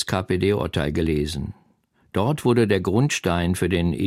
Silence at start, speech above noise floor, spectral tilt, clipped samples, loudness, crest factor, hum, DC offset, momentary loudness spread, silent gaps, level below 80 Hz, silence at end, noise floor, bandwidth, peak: 0 s; 41 dB; -6 dB/octave; under 0.1%; -22 LUFS; 16 dB; none; under 0.1%; 7 LU; none; -40 dBFS; 0 s; -62 dBFS; 15.5 kHz; -6 dBFS